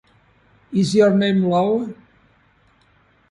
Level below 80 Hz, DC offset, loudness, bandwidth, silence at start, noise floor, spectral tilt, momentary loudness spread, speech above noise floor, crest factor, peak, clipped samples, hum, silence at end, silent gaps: -60 dBFS; under 0.1%; -18 LUFS; 11.5 kHz; 0.7 s; -57 dBFS; -6.5 dB/octave; 10 LU; 41 dB; 18 dB; -4 dBFS; under 0.1%; none; 1.35 s; none